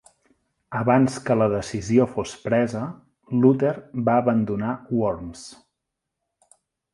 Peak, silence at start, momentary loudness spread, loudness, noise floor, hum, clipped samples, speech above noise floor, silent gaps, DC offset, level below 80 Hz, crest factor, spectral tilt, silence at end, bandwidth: -4 dBFS; 0.7 s; 13 LU; -22 LUFS; -82 dBFS; none; under 0.1%; 60 dB; none; under 0.1%; -54 dBFS; 20 dB; -7 dB/octave; 1.4 s; 11.5 kHz